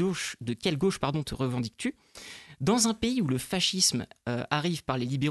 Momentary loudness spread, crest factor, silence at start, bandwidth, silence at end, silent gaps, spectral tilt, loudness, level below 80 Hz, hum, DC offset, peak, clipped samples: 11 LU; 20 dB; 0 s; 12.5 kHz; 0 s; none; -4 dB/octave; -28 LUFS; -54 dBFS; none; under 0.1%; -8 dBFS; under 0.1%